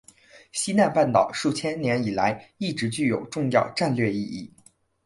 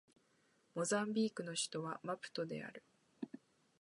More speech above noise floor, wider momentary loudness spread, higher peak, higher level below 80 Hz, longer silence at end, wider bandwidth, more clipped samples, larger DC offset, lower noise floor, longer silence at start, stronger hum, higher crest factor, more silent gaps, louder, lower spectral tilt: about the same, 35 dB vs 35 dB; second, 10 LU vs 15 LU; first, -6 dBFS vs -24 dBFS; first, -60 dBFS vs -88 dBFS; about the same, 0.6 s vs 0.55 s; about the same, 11.5 kHz vs 11.5 kHz; neither; neither; second, -59 dBFS vs -76 dBFS; second, 0.35 s vs 0.75 s; neither; about the same, 18 dB vs 20 dB; neither; first, -24 LUFS vs -41 LUFS; about the same, -5 dB/octave vs -4 dB/octave